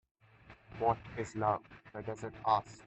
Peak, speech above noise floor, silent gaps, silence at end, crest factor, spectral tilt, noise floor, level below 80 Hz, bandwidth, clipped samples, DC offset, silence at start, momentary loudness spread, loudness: -16 dBFS; 25 dB; none; 0.05 s; 22 dB; -6 dB/octave; -60 dBFS; -64 dBFS; 8.4 kHz; under 0.1%; under 0.1%; 0.5 s; 13 LU; -36 LUFS